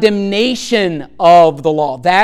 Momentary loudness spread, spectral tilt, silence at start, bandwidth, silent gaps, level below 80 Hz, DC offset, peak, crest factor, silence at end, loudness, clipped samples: 8 LU; -5 dB/octave; 0 s; 12.5 kHz; none; -48 dBFS; under 0.1%; 0 dBFS; 12 dB; 0 s; -12 LUFS; under 0.1%